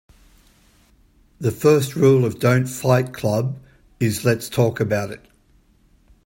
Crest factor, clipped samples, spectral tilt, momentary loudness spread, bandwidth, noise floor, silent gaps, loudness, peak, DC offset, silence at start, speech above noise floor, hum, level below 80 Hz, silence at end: 18 dB; under 0.1%; -6.5 dB/octave; 10 LU; 16.5 kHz; -57 dBFS; none; -20 LUFS; -2 dBFS; under 0.1%; 1.4 s; 38 dB; none; -54 dBFS; 1.1 s